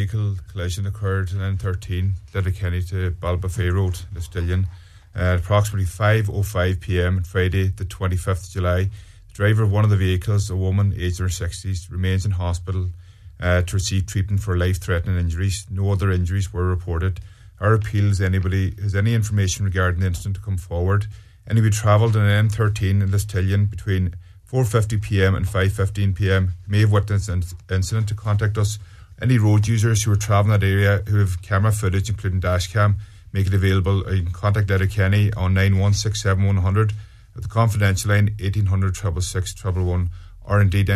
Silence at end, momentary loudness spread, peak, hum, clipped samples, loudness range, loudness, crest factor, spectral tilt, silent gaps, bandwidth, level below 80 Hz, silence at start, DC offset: 0 s; 8 LU; -2 dBFS; none; under 0.1%; 4 LU; -21 LUFS; 16 dB; -6 dB/octave; none; 13.5 kHz; -36 dBFS; 0 s; under 0.1%